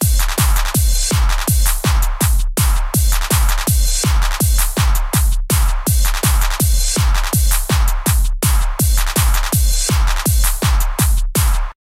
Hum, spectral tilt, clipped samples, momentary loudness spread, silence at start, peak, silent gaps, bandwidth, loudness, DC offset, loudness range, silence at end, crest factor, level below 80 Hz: none; -3.5 dB/octave; under 0.1%; 2 LU; 0 s; -2 dBFS; none; 16.5 kHz; -16 LUFS; under 0.1%; 0 LU; 0.2 s; 12 dB; -16 dBFS